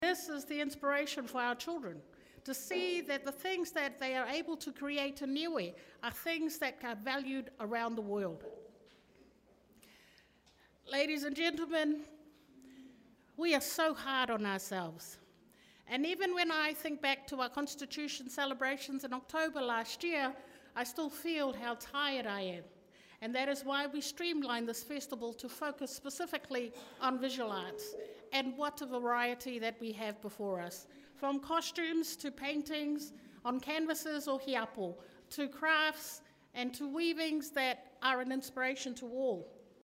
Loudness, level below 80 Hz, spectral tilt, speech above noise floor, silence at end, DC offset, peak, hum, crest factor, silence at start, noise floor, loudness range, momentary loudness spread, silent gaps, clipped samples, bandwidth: -37 LUFS; -76 dBFS; -3 dB/octave; 30 dB; 0.25 s; under 0.1%; -18 dBFS; none; 22 dB; 0 s; -68 dBFS; 3 LU; 10 LU; none; under 0.1%; 16 kHz